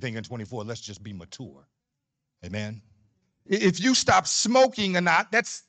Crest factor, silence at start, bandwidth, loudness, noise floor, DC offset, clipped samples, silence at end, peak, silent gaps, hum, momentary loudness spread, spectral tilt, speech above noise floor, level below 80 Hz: 18 dB; 0 s; 9.4 kHz; -23 LUFS; -83 dBFS; under 0.1%; under 0.1%; 0.1 s; -8 dBFS; none; none; 21 LU; -3.5 dB/octave; 58 dB; -60 dBFS